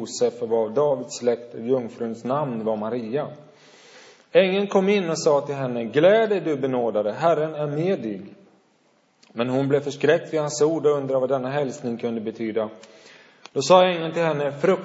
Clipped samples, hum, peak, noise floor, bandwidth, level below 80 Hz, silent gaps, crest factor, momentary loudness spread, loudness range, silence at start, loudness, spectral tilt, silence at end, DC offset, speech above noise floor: under 0.1%; none; -2 dBFS; -62 dBFS; 8 kHz; -76 dBFS; none; 20 dB; 11 LU; 5 LU; 0 s; -23 LUFS; -5.5 dB/octave; 0 s; under 0.1%; 40 dB